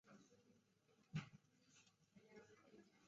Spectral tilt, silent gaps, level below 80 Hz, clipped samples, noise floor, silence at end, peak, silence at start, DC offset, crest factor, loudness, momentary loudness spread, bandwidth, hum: -6 dB/octave; none; -86 dBFS; under 0.1%; -79 dBFS; 0 s; -38 dBFS; 0.05 s; under 0.1%; 24 dB; -57 LUFS; 16 LU; 7.4 kHz; none